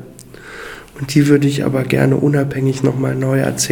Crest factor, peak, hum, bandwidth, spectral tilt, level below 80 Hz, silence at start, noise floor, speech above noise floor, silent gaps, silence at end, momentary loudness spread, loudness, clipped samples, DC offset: 16 dB; 0 dBFS; none; 18 kHz; -6 dB/octave; -46 dBFS; 0 s; -37 dBFS; 22 dB; none; 0 s; 19 LU; -15 LUFS; under 0.1%; under 0.1%